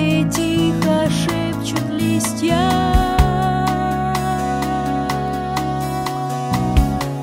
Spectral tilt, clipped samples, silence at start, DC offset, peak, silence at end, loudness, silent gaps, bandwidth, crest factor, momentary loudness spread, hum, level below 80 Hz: -5.5 dB/octave; under 0.1%; 0 s; under 0.1%; 0 dBFS; 0 s; -19 LUFS; none; 16.5 kHz; 18 dB; 5 LU; none; -26 dBFS